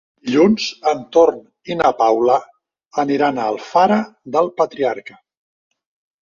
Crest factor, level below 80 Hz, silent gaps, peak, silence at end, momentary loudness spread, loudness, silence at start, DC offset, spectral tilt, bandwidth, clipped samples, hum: 16 dB; -58 dBFS; none; -2 dBFS; 1.15 s; 8 LU; -17 LUFS; 0.25 s; under 0.1%; -5.5 dB/octave; 7.2 kHz; under 0.1%; none